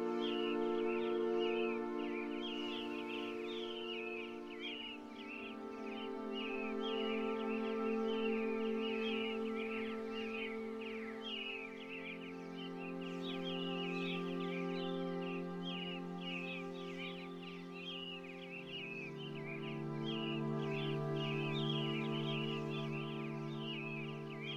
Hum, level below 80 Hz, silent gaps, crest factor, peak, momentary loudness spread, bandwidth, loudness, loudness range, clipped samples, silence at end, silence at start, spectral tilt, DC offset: none; -74 dBFS; none; 14 dB; -26 dBFS; 9 LU; 12 kHz; -41 LUFS; 6 LU; under 0.1%; 0 s; 0 s; -6.5 dB/octave; under 0.1%